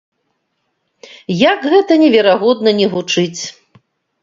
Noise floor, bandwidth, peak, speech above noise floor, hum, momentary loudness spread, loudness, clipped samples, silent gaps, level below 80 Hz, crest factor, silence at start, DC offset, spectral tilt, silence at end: -68 dBFS; 7.8 kHz; 0 dBFS; 56 dB; none; 14 LU; -12 LUFS; under 0.1%; none; -60 dBFS; 14 dB; 1.3 s; under 0.1%; -4.5 dB/octave; 0.7 s